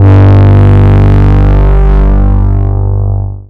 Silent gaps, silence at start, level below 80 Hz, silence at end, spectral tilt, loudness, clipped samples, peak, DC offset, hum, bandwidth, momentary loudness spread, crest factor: none; 0 s; -8 dBFS; 0.05 s; -10.5 dB/octave; -7 LUFS; 0.3%; 0 dBFS; under 0.1%; 50 Hz at -10 dBFS; 4.1 kHz; 8 LU; 4 dB